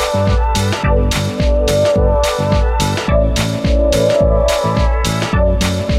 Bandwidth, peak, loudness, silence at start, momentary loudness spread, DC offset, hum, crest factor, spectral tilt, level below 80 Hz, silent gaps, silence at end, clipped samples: 15 kHz; -2 dBFS; -15 LUFS; 0 s; 3 LU; under 0.1%; none; 12 dB; -5.5 dB/octave; -18 dBFS; none; 0 s; under 0.1%